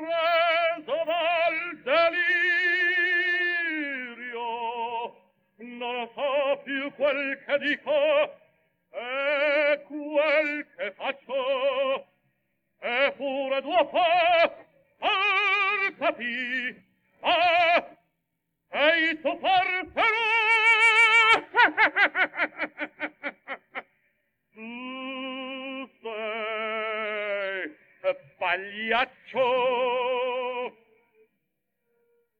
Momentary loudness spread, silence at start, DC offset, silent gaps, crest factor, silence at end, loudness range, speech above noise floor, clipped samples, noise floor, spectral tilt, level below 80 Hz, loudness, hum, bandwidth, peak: 15 LU; 0 s; under 0.1%; none; 20 dB; 1.7 s; 11 LU; 56 dB; under 0.1%; -80 dBFS; -2.5 dB/octave; -72 dBFS; -24 LUFS; none; 19.5 kHz; -6 dBFS